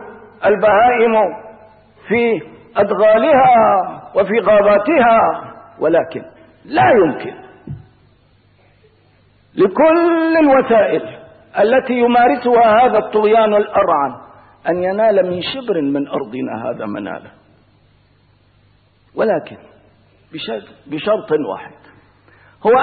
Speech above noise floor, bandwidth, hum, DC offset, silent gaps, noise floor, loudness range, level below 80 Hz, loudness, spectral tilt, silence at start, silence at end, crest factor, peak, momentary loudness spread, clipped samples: 40 dB; 4.7 kHz; 50 Hz at -55 dBFS; under 0.1%; none; -53 dBFS; 12 LU; -52 dBFS; -14 LUFS; -11 dB/octave; 0 s; 0 s; 12 dB; -4 dBFS; 17 LU; under 0.1%